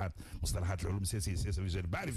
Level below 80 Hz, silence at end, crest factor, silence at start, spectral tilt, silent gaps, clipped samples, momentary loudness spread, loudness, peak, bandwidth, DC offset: -44 dBFS; 0 s; 10 dB; 0 s; -5 dB/octave; none; under 0.1%; 3 LU; -37 LUFS; -26 dBFS; 14 kHz; under 0.1%